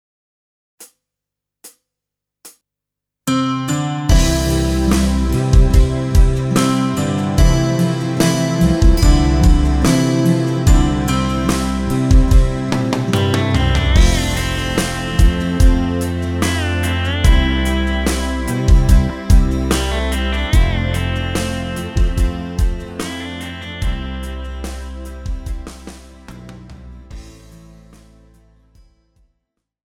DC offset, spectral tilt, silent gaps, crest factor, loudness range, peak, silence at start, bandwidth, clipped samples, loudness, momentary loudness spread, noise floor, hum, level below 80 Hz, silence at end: under 0.1%; -5.5 dB/octave; none; 14 dB; 13 LU; 0 dBFS; 0.8 s; 16 kHz; under 0.1%; -16 LUFS; 14 LU; -83 dBFS; none; -18 dBFS; 2.65 s